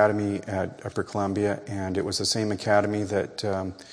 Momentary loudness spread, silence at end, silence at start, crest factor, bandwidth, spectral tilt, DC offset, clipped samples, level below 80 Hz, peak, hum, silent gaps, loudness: 8 LU; 0 s; 0 s; 20 dB; 11 kHz; -4.5 dB/octave; under 0.1%; under 0.1%; -60 dBFS; -6 dBFS; none; none; -27 LUFS